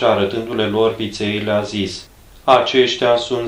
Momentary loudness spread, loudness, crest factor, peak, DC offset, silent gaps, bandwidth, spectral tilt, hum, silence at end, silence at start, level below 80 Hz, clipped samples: 10 LU; -17 LUFS; 18 dB; 0 dBFS; under 0.1%; none; 14.5 kHz; -5 dB/octave; none; 0 s; 0 s; -48 dBFS; under 0.1%